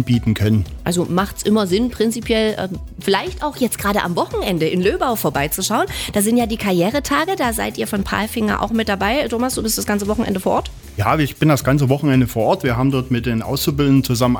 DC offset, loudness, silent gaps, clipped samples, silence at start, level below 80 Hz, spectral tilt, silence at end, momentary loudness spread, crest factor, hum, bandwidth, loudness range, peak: under 0.1%; -18 LUFS; none; under 0.1%; 0 s; -36 dBFS; -5 dB/octave; 0 s; 5 LU; 16 dB; none; over 20 kHz; 2 LU; -2 dBFS